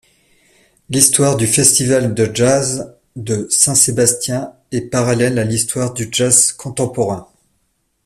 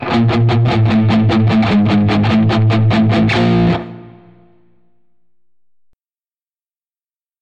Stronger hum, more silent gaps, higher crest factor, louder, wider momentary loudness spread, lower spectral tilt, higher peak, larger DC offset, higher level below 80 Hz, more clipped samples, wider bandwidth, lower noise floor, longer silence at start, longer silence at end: neither; neither; first, 16 dB vs 10 dB; about the same, -14 LUFS vs -13 LUFS; first, 13 LU vs 2 LU; second, -3.5 dB/octave vs -8 dB/octave; first, 0 dBFS vs -6 dBFS; neither; second, -48 dBFS vs -38 dBFS; neither; first, 16 kHz vs 7.6 kHz; second, -65 dBFS vs under -90 dBFS; first, 0.9 s vs 0 s; second, 0.8 s vs 3.35 s